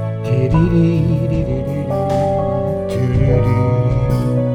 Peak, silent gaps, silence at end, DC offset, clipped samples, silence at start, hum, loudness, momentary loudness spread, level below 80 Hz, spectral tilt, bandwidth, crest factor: -2 dBFS; none; 0 s; under 0.1%; under 0.1%; 0 s; none; -16 LUFS; 5 LU; -28 dBFS; -9.5 dB/octave; 11.5 kHz; 12 dB